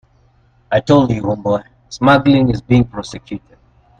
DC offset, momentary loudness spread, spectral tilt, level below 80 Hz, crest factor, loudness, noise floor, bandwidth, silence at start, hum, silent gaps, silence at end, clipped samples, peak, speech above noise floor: under 0.1%; 18 LU; -7 dB/octave; -40 dBFS; 16 dB; -14 LUFS; -53 dBFS; 9.2 kHz; 0.7 s; none; none; 0.65 s; under 0.1%; 0 dBFS; 39 dB